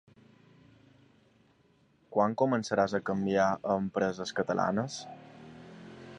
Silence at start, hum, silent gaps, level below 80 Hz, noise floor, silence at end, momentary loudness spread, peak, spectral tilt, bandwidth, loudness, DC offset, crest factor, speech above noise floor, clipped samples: 2.1 s; none; none; -66 dBFS; -66 dBFS; 0 s; 22 LU; -12 dBFS; -6 dB/octave; 10 kHz; -30 LUFS; under 0.1%; 20 dB; 37 dB; under 0.1%